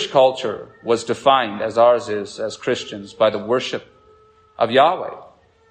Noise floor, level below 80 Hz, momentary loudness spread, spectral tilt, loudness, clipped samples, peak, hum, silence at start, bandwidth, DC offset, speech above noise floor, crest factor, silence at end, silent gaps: -52 dBFS; -64 dBFS; 13 LU; -4 dB/octave; -19 LUFS; under 0.1%; -2 dBFS; none; 0 s; 9.6 kHz; under 0.1%; 33 dB; 18 dB; 0.45 s; none